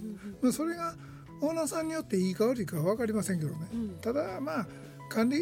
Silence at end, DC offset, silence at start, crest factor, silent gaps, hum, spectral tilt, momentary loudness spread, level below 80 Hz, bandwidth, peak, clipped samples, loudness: 0 s; under 0.1%; 0 s; 16 dB; none; none; -6 dB/octave; 9 LU; -62 dBFS; 16.5 kHz; -16 dBFS; under 0.1%; -32 LUFS